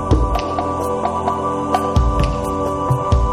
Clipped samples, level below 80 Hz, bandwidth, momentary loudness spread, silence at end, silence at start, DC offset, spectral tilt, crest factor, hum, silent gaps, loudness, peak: under 0.1%; -22 dBFS; 15.5 kHz; 4 LU; 0 s; 0 s; under 0.1%; -7 dB/octave; 16 dB; none; none; -19 LUFS; -2 dBFS